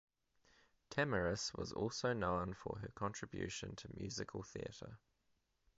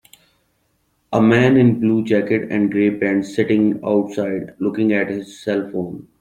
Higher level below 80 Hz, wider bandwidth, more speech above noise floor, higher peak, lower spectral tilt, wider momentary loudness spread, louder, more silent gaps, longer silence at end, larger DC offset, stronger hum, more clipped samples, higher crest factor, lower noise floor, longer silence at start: second, -62 dBFS vs -56 dBFS; second, 7.6 kHz vs 10.5 kHz; second, 39 dB vs 48 dB; second, -22 dBFS vs -2 dBFS; second, -4 dB/octave vs -7.5 dB/octave; about the same, 11 LU vs 11 LU; second, -43 LUFS vs -18 LUFS; neither; first, 0.8 s vs 0.2 s; neither; neither; neither; first, 22 dB vs 16 dB; first, -81 dBFS vs -65 dBFS; second, 0.9 s vs 1.1 s